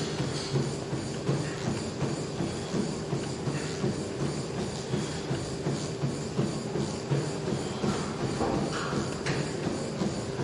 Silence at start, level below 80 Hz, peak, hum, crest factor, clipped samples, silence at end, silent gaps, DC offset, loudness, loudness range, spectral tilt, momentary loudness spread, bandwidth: 0 s; -52 dBFS; -16 dBFS; none; 16 dB; under 0.1%; 0 s; none; under 0.1%; -32 LUFS; 1 LU; -5.5 dB/octave; 3 LU; 11.5 kHz